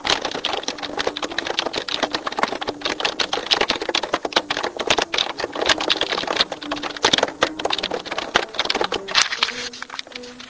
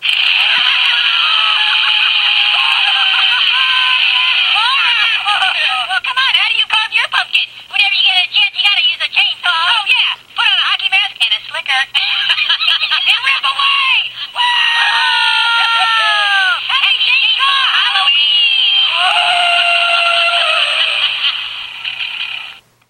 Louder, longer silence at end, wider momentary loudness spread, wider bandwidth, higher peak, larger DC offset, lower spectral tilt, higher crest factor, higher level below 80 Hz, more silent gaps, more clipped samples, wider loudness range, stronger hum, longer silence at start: second, -21 LUFS vs -10 LUFS; second, 0 s vs 0.35 s; about the same, 7 LU vs 5 LU; second, 8 kHz vs 16 kHz; about the same, 0 dBFS vs 0 dBFS; neither; first, -1 dB/octave vs 2.5 dB/octave; first, 24 dB vs 14 dB; first, -52 dBFS vs -64 dBFS; neither; neither; about the same, 2 LU vs 2 LU; neither; about the same, 0 s vs 0 s